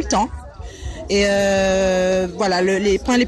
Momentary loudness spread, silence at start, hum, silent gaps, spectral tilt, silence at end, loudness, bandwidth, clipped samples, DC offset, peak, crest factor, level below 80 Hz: 16 LU; 0 s; none; none; -4.5 dB/octave; 0 s; -18 LUFS; 13 kHz; under 0.1%; under 0.1%; -6 dBFS; 12 dB; -34 dBFS